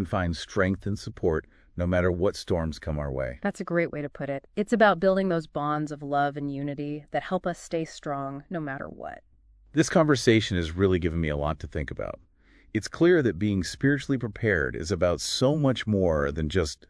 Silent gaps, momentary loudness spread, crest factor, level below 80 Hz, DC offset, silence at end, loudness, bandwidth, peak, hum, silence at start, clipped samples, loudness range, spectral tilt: none; 12 LU; 20 dB; -44 dBFS; under 0.1%; 0.15 s; -27 LUFS; 11 kHz; -6 dBFS; none; 0 s; under 0.1%; 5 LU; -6 dB/octave